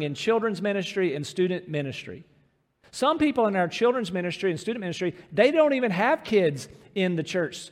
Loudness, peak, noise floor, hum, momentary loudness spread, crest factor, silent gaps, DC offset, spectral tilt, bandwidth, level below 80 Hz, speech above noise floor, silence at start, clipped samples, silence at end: -25 LUFS; -6 dBFS; -65 dBFS; none; 9 LU; 18 dB; none; under 0.1%; -5.5 dB/octave; 14 kHz; -66 dBFS; 40 dB; 0 s; under 0.1%; 0.05 s